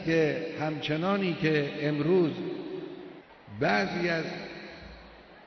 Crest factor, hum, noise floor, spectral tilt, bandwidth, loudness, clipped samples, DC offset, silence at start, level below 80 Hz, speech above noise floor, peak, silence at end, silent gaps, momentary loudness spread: 16 dB; none; -51 dBFS; -7 dB/octave; 6.4 kHz; -29 LUFS; under 0.1%; under 0.1%; 0 s; -60 dBFS; 23 dB; -14 dBFS; 0 s; none; 19 LU